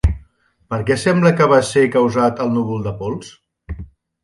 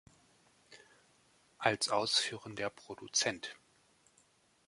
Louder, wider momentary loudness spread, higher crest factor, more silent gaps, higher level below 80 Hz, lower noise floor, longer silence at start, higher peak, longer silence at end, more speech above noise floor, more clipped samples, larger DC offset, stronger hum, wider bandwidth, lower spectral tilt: first, -16 LUFS vs -34 LUFS; first, 20 LU vs 14 LU; second, 16 dB vs 28 dB; neither; first, -30 dBFS vs -76 dBFS; second, -52 dBFS vs -70 dBFS; second, 0.05 s vs 0.7 s; first, 0 dBFS vs -12 dBFS; second, 0.4 s vs 1.15 s; about the same, 36 dB vs 35 dB; neither; neither; neither; about the same, 11.5 kHz vs 11.5 kHz; first, -6.5 dB/octave vs -1.5 dB/octave